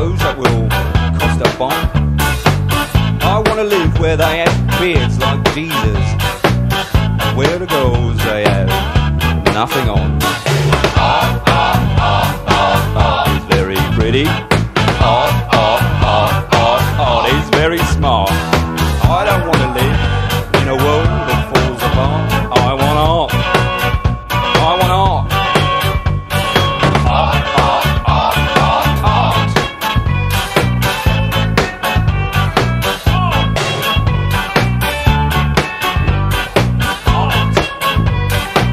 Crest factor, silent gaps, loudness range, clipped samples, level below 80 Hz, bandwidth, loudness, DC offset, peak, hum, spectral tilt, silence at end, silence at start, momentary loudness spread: 12 dB; none; 2 LU; under 0.1%; -22 dBFS; 16 kHz; -13 LUFS; under 0.1%; 0 dBFS; none; -5.5 dB/octave; 0 s; 0 s; 3 LU